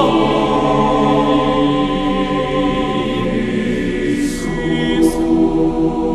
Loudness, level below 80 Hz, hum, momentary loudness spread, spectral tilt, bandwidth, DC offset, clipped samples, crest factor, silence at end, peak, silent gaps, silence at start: -16 LUFS; -30 dBFS; none; 4 LU; -6 dB/octave; 13 kHz; under 0.1%; under 0.1%; 14 dB; 0 s; 0 dBFS; none; 0 s